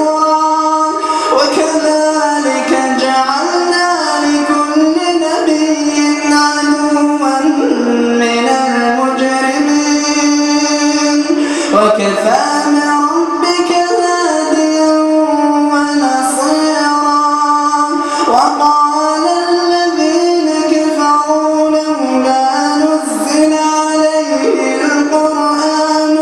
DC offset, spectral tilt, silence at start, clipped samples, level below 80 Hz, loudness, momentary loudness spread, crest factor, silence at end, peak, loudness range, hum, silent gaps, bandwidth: under 0.1%; -2.5 dB/octave; 0 s; under 0.1%; -56 dBFS; -11 LUFS; 2 LU; 12 dB; 0 s; 0 dBFS; 1 LU; none; none; 12.5 kHz